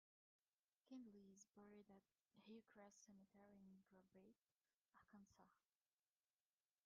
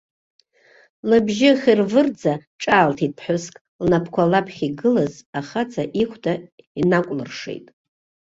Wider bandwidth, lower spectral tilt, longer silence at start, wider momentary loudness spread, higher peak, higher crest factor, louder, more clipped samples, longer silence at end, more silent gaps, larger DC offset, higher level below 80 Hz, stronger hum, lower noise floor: second, 6.8 kHz vs 7.8 kHz; about the same, -5.5 dB/octave vs -6 dB/octave; second, 0.85 s vs 1.05 s; second, 6 LU vs 14 LU; second, -52 dBFS vs -2 dBFS; about the same, 18 dB vs 18 dB; second, -67 LUFS vs -20 LUFS; neither; first, 1.25 s vs 0.7 s; second, 4.51-4.55 s, 4.76-4.85 s vs 2.47-2.59 s, 3.61-3.79 s, 5.26-5.33 s, 6.52-6.58 s, 6.67-6.75 s; neither; second, under -90 dBFS vs -56 dBFS; neither; first, under -90 dBFS vs -55 dBFS